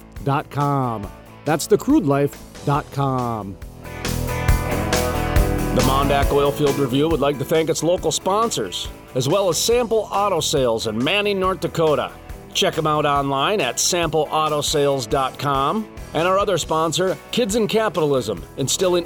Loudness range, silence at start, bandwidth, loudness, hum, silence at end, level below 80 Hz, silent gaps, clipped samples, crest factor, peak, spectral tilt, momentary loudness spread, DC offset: 3 LU; 0.05 s; 19.5 kHz; -20 LUFS; none; 0 s; -32 dBFS; none; under 0.1%; 16 dB; -4 dBFS; -4.5 dB/octave; 8 LU; under 0.1%